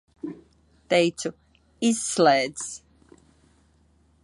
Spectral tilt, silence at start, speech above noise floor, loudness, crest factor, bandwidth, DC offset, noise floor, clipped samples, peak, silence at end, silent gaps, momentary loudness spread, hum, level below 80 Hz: -3.5 dB/octave; 0.25 s; 39 dB; -24 LUFS; 22 dB; 11.5 kHz; under 0.1%; -61 dBFS; under 0.1%; -6 dBFS; 1.45 s; none; 19 LU; none; -64 dBFS